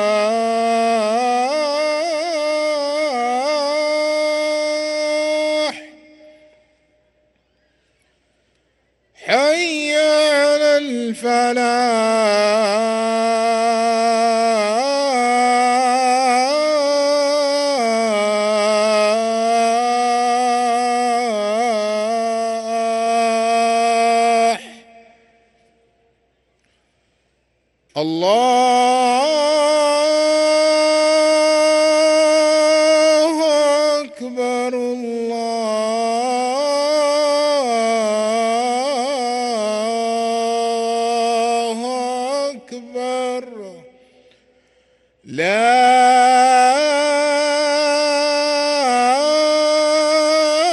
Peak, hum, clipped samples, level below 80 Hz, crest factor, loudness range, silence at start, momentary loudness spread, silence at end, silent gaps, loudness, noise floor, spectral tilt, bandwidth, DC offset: -2 dBFS; none; under 0.1%; -68 dBFS; 16 dB; 8 LU; 0 s; 8 LU; 0 s; none; -16 LUFS; -65 dBFS; -2 dB/octave; 12 kHz; under 0.1%